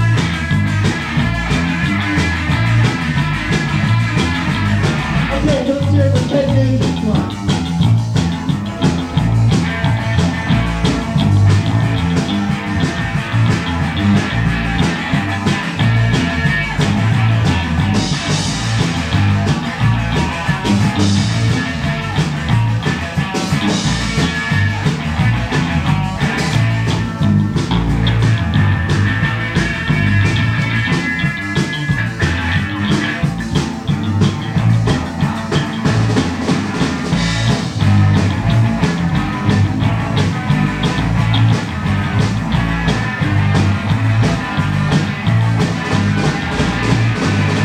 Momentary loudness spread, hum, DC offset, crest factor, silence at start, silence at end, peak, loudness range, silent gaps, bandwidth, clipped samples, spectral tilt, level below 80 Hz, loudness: 4 LU; none; under 0.1%; 14 dB; 0 s; 0 s; 0 dBFS; 1 LU; none; 11 kHz; under 0.1%; -6 dB/octave; -30 dBFS; -16 LUFS